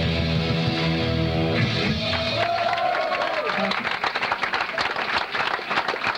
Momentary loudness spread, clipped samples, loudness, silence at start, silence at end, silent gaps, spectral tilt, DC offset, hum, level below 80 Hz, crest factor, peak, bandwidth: 2 LU; under 0.1%; -23 LUFS; 0 s; 0 s; none; -5.5 dB/octave; under 0.1%; none; -42 dBFS; 14 dB; -10 dBFS; 11.5 kHz